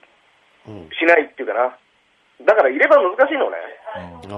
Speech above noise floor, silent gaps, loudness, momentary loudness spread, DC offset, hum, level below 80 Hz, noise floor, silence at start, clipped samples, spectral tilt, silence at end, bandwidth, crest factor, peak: 42 dB; none; -16 LUFS; 19 LU; under 0.1%; none; -62 dBFS; -59 dBFS; 0.7 s; under 0.1%; -5.5 dB/octave; 0 s; 7.4 kHz; 18 dB; -2 dBFS